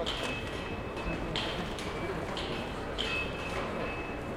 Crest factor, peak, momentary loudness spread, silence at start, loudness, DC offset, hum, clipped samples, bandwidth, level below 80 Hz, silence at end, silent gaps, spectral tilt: 18 dB; -18 dBFS; 5 LU; 0 s; -35 LUFS; under 0.1%; none; under 0.1%; 16.5 kHz; -46 dBFS; 0 s; none; -4.5 dB/octave